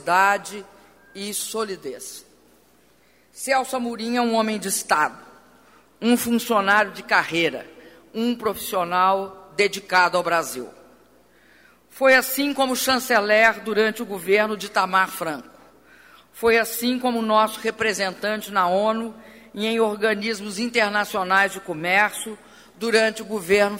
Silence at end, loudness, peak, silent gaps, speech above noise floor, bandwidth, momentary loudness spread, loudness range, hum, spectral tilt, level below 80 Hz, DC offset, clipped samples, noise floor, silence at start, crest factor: 0 s; -21 LUFS; -4 dBFS; none; 36 dB; 16 kHz; 13 LU; 4 LU; 60 Hz at -60 dBFS; -3 dB/octave; -62 dBFS; under 0.1%; under 0.1%; -58 dBFS; 0 s; 18 dB